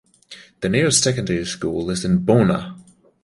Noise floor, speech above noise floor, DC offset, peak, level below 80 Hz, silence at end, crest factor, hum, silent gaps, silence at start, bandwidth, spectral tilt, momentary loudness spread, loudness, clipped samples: -45 dBFS; 26 dB; under 0.1%; -2 dBFS; -46 dBFS; 0.4 s; 18 dB; none; none; 0.3 s; 11.5 kHz; -4.5 dB/octave; 10 LU; -19 LUFS; under 0.1%